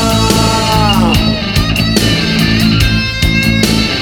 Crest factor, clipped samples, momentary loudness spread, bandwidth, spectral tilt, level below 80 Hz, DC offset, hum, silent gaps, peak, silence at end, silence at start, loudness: 10 dB; under 0.1%; 2 LU; 18.5 kHz; -4.5 dB/octave; -20 dBFS; under 0.1%; none; none; 0 dBFS; 0 s; 0 s; -11 LUFS